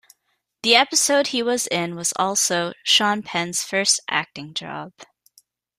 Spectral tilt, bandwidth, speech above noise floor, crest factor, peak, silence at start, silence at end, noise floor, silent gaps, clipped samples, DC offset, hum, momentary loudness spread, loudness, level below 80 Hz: -1.5 dB/octave; 15.5 kHz; 51 dB; 20 dB; -2 dBFS; 0.65 s; 0.75 s; -73 dBFS; none; under 0.1%; under 0.1%; none; 14 LU; -20 LUFS; -68 dBFS